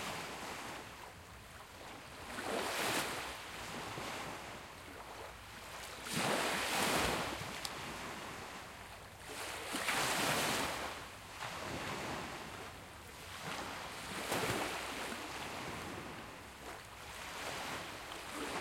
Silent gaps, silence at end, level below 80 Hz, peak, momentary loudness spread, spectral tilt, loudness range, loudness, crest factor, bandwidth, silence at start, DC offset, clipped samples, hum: none; 0 s; -62 dBFS; -16 dBFS; 16 LU; -2.5 dB/octave; 6 LU; -40 LUFS; 24 dB; 16.5 kHz; 0 s; under 0.1%; under 0.1%; none